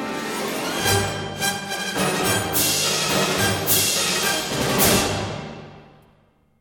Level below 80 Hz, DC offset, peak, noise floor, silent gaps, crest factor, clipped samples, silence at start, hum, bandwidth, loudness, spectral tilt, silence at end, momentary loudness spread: -46 dBFS; under 0.1%; -4 dBFS; -59 dBFS; none; 18 dB; under 0.1%; 0 s; none; 17 kHz; -20 LUFS; -2.5 dB/octave; 0.75 s; 10 LU